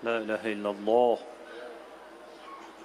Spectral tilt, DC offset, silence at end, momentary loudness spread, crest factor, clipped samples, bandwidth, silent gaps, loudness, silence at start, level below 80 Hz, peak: -5.5 dB/octave; under 0.1%; 0 s; 23 LU; 20 dB; under 0.1%; 12.5 kHz; none; -28 LUFS; 0 s; -74 dBFS; -10 dBFS